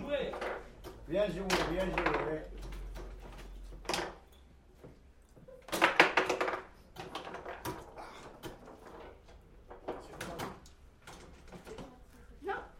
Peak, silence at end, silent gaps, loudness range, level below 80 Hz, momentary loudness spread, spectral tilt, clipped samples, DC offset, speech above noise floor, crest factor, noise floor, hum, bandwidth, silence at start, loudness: -6 dBFS; 0 s; none; 15 LU; -52 dBFS; 22 LU; -4 dB/octave; under 0.1%; under 0.1%; 25 dB; 32 dB; -59 dBFS; none; 16 kHz; 0 s; -35 LUFS